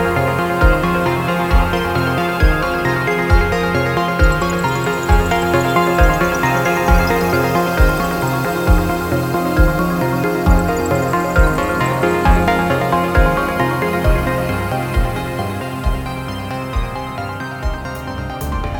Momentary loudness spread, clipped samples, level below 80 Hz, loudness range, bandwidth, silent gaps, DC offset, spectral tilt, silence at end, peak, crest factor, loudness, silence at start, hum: 9 LU; under 0.1%; -20 dBFS; 6 LU; over 20 kHz; none; under 0.1%; -6 dB/octave; 0 s; 0 dBFS; 14 dB; -17 LUFS; 0 s; none